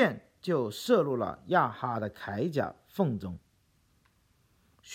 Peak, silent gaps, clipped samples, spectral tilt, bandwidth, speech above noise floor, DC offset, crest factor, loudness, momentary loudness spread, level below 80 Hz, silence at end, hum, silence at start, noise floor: -10 dBFS; none; under 0.1%; -6.5 dB/octave; 16.5 kHz; 39 dB; under 0.1%; 20 dB; -31 LUFS; 11 LU; -66 dBFS; 0 s; none; 0 s; -69 dBFS